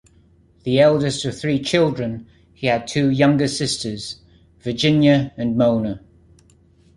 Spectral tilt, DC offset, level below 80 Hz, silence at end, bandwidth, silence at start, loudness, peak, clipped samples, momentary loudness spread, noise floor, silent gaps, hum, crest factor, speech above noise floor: -5.5 dB/octave; under 0.1%; -50 dBFS; 1 s; 11.5 kHz; 0.65 s; -19 LUFS; -2 dBFS; under 0.1%; 16 LU; -54 dBFS; none; none; 18 dB; 36 dB